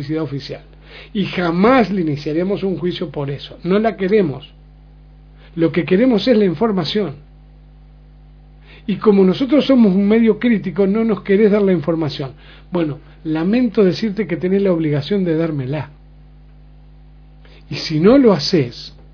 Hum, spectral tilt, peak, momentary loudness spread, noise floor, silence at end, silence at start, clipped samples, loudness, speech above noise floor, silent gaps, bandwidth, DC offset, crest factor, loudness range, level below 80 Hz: 50 Hz at -40 dBFS; -7.5 dB/octave; 0 dBFS; 13 LU; -42 dBFS; 0.25 s; 0 s; under 0.1%; -16 LUFS; 26 dB; none; 5.4 kHz; under 0.1%; 16 dB; 6 LU; -44 dBFS